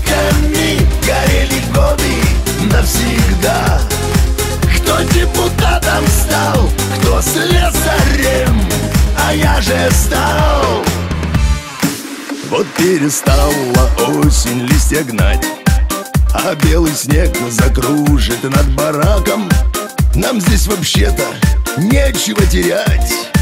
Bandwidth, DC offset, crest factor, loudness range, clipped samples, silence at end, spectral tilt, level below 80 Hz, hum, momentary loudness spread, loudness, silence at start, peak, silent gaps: 16.5 kHz; under 0.1%; 12 dB; 1 LU; under 0.1%; 0 s; -4.5 dB/octave; -16 dBFS; none; 3 LU; -13 LUFS; 0 s; 0 dBFS; none